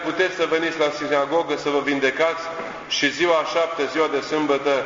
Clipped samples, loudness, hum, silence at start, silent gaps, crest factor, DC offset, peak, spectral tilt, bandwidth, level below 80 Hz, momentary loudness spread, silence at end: under 0.1%; -21 LUFS; none; 0 s; none; 18 dB; under 0.1%; -4 dBFS; -3.5 dB/octave; 7.6 kHz; -62 dBFS; 4 LU; 0 s